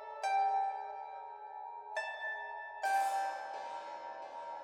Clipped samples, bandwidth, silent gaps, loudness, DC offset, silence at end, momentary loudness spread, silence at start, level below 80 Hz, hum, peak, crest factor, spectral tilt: under 0.1%; 17 kHz; none; -38 LUFS; under 0.1%; 0 s; 14 LU; 0 s; -88 dBFS; none; -24 dBFS; 16 dB; 0.5 dB/octave